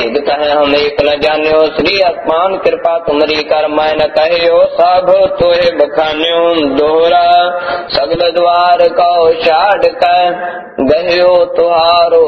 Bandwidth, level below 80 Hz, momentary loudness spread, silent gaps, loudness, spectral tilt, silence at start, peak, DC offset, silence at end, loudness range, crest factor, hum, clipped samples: 6.2 kHz; -42 dBFS; 4 LU; none; -10 LUFS; -5.5 dB/octave; 0 s; 0 dBFS; under 0.1%; 0 s; 1 LU; 10 dB; none; 0.2%